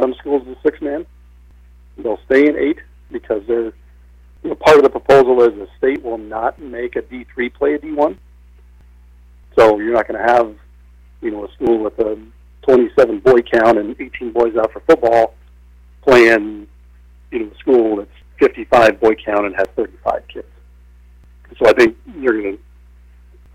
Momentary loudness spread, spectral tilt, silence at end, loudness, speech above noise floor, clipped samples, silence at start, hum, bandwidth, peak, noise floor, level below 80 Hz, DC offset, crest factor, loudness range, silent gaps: 16 LU; -5.5 dB/octave; 1 s; -15 LUFS; 29 dB; under 0.1%; 0 s; 60 Hz at -50 dBFS; 13 kHz; -2 dBFS; -44 dBFS; -42 dBFS; under 0.1%; 14 dB; 5 LU; none